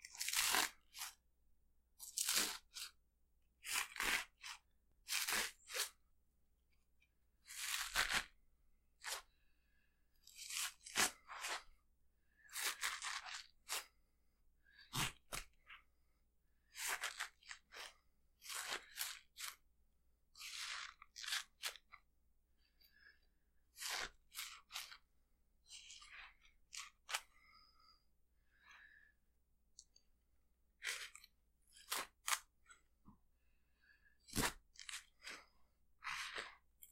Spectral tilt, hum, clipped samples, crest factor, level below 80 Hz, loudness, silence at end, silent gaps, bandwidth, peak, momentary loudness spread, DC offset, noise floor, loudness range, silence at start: 0 dB/octave; none; under 0.1%; 32 dB; -70 dBFS; -44 LUFS; 0 s; none; 16 kHz; -18 dBFS; 19 LU; under 0.1%; -78 dBFS; 11 LU; 0 s